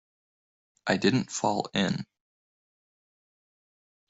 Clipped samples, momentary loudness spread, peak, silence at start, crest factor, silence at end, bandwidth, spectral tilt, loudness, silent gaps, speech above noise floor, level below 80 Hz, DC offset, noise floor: under 0.1%; 11 LU; -10 dBFS; 0.85 s; 22 dB; 2.05 s; 8.2 kHz; -4.5 dB/octave; -28 LUFS; none; over 63 dB; -68 dBFS; under 0.1%; under -90 dBFS